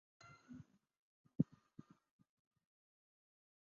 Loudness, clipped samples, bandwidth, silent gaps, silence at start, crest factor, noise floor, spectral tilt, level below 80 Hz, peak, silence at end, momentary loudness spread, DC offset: -43 LUFS; under 0.1%; 7 kHz; 0.97-1.24 s; 0.25 s; 30 dB; -64 dBFS; -10 dB/octave; -80 dBFS; -22 dBFS; 2.25 s; 21 LU; under 0.1%